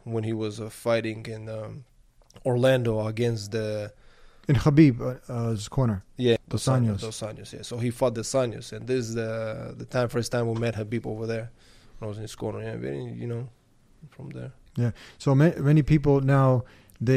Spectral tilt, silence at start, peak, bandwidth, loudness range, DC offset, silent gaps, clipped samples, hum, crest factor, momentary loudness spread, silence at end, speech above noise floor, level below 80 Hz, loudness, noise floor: -7 dB/octave; 0.05 s; -6 dBFS; 14.5 kHz; 10 LU; under 0.1%; none; under 0.1%; none; 20 dB; 16 LU; 0 s; 28 dB; -48 dBFS; -26 LUFS; -54 dBFS